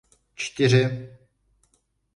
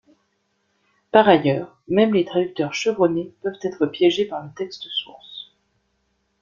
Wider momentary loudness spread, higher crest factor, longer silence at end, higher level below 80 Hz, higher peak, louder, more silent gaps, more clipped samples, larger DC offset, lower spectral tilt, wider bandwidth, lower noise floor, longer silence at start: first, 18 LU vs 15 LU; about the same, 18 dB vs 20 dB; about the same, 1.05 s vs 1 s; about the same, -60 dBFS vs -64 dBFS; second, -8 dBFS vs 0 dBFS; about the same, -22 LUFS vs -21 LUFS; neither; neither; neither; about the same, -5.5 dB/octave vs -5.5 dB/octave; first, 10.5 kHz vs 7.4 kHz; about the same, -69 dBFS vs -70 dBFS; second, 0.4 s vs 1.15 s